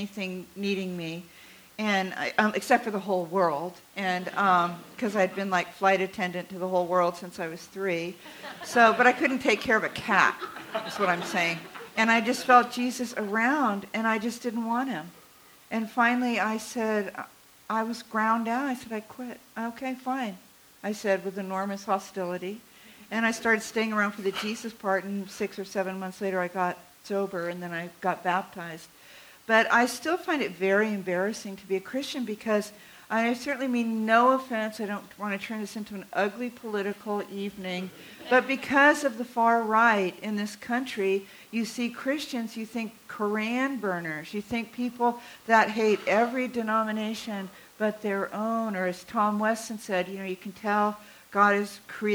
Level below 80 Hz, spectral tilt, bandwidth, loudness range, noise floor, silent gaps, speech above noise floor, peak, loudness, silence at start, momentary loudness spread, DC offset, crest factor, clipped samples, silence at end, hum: -70 dBFS; -4.5 dB/octave; over 20 kHz; 7 LU; -55 dBFS; none; 27 dB; -6 dBFS; -27 LUFS; 0 s; 13 LU; under 0.1%; 22 dB; under 0.1%; 0 s; none